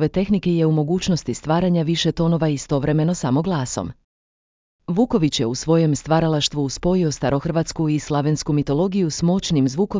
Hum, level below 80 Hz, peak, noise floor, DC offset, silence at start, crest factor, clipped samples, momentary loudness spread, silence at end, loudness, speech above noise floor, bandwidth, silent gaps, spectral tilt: none; -42 dBFS; -4 dBFS; under -90 dBFS; under 0.1%; 0 s; 16 dB; under 0.1%; 4 LU; 0 s; -20 LUFS; over 71 dB; 7.6 kHz; 4.04-4.79 s; -6 dB/octave